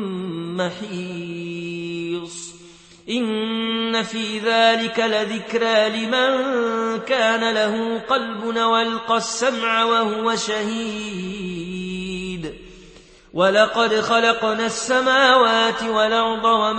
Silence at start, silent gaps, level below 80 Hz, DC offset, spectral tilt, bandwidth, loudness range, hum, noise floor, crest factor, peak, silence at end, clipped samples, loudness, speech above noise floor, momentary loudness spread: 0 s; none; -54 dBFS; under 0.1%; -3.5 dB/octave; 8.8 kHz; 8 LU; none; -46 dBFS; 20 dB; -2 dBFS; 0 s; under 0.1%; -20 LUFS; 27 dB; 13 LU